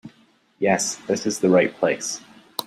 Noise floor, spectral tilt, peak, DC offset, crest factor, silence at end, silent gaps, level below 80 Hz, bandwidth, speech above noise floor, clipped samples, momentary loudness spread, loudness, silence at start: -58 dBFS; -4 dB/octave; -4 dBFS; under 0.1%; 18 dB; 0.05 s; none; -66 dBFS; 15.5 kHz; 37 dB; under 0.1%; 12 LU; -22 LUFS; 0.05 s